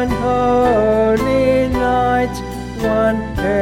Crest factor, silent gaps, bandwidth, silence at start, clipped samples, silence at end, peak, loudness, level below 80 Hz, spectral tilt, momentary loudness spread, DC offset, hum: 12 dB; none; 16.5 kHz; 0 s; under 0.1%; 0 s; -2 dBFS; -16 LUFS; -30 dBFS; -6.5 dB/octave; 8 LU; under 0.1%; none